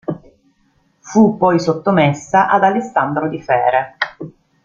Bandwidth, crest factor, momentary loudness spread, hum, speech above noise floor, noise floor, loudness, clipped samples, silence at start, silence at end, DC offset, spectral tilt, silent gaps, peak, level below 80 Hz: 7.6 kHz; 14 dB; 12 LU; none; 45 dB; -59 dBFS; -15 LUFS; under 0.1%; 0.1 s; 0.35 s; under 0.1%; -6.5 dB/octave; none; -2 dBFS; -54 dBFS